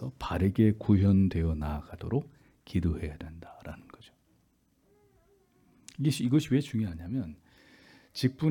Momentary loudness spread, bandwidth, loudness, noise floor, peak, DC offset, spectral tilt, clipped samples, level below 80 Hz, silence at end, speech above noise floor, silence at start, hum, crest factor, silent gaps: 21 LU; 17.5 kHz; -29 LUFS; -69 dBFS; -12 dBFS; under 0.1%; -7.5 dB/octave; under 0.1%; -48 dBFS; 0 s; 42 dB; 0 s; none; 18 dB; none